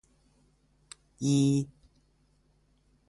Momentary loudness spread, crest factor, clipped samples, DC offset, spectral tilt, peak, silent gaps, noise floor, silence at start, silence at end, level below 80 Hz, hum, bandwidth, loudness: 27 LU; 18 dB; under 0.1%; under 0.1%; -6.5 dB/octave; -16 dBFS; none; -68 dBFS; 1.2 s; 1.4 s; -64 dBFS; none; 11.5 kHz; -28 LUFS